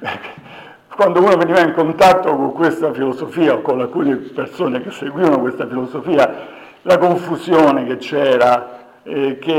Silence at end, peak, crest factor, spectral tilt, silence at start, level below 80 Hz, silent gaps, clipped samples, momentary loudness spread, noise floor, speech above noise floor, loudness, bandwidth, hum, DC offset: 0 s; -4 dBFS; 12 dB; -6 dB/octave; 0 s; -56 dBFS; none; under 0.1%; 14 LU; -38 dBFS; 24 dB; -15 LUFS; 16.5 kHz; none; under 0.1%